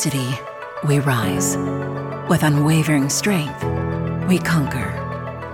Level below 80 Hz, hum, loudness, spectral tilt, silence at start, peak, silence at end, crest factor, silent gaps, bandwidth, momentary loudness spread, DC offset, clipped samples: -42 dBFS; none; -20 LUFS; -5 dB/octave; 0 s; -4 dBFS; 0 s; 14 dB; none; 17.5 kHz; 10 LU; under 0.1%; under 0.1%